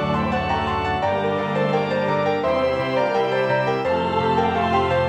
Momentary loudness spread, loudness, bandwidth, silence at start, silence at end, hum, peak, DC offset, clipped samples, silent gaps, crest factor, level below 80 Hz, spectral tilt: 2 LU; -21 LUFS; 10 kHz; 0 s; 0 s; none; -8 dBFS; under 0.1%; under 0.1%; none; 12 dB; -44 dBFS; -7 dB/octave